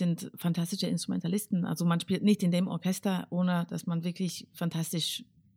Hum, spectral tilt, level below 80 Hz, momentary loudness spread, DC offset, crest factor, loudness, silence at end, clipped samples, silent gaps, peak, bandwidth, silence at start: none; -5.5 dB/octave; -76 dBFS; 7 LU; under 0.1%; 16 dB; -31 LUFS; 0.35 s; under 0.1%; none; -14 dBFS; 16.5 kHz; 0 s